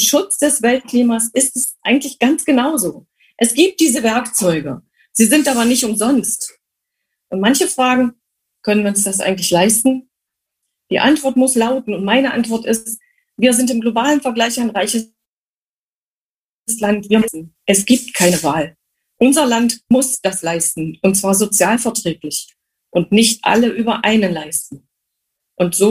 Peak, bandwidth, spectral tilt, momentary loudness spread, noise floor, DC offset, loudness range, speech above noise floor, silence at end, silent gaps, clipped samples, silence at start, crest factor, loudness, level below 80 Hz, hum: 0 dBFS; 15.5 kHz; -3 dB/octave; 9 LU; under -90 dBFS; under 0.1%; 3 LU; over 75 dB; 0 s; 15.28-16.66 s; under 0.1%; 0 s; 16 dB; -15 LUFS; -54 dBFS; none